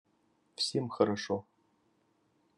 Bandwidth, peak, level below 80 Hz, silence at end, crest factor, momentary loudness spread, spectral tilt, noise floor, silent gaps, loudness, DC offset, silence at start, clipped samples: 11.5 kHz; -12 dBFS; -82 dBFS; 1.15 s; 26 dB; 8 LU; -4.5 dB/octave; -73 dBFS; none; -33 LUFS; under 0.1%; 0.6 s; under 0.1%